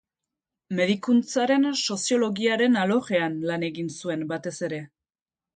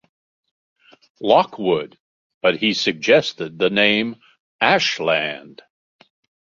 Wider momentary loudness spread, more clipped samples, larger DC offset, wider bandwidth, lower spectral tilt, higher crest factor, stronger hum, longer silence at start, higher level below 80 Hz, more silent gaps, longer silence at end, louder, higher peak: about the same, 10 LU vs 11 LU; neither; neither; first, 9.4 kHz vs 7.6 kHz; about the same, -4.5 dB/octave vs -4 dB/octave; about the same, 16 dB vs 20 dB; neither; second, 0.7 s vs 1.2 s; second, -72 dBFS vs -64 dBFS; second, none vs 2.00-2.41 s, 4.40-4.59 s; second, 0.7 s vs 1.1 s; second, -25 LUFS vs -18 LUFS; second, -10 dBFS vs -2 dBFS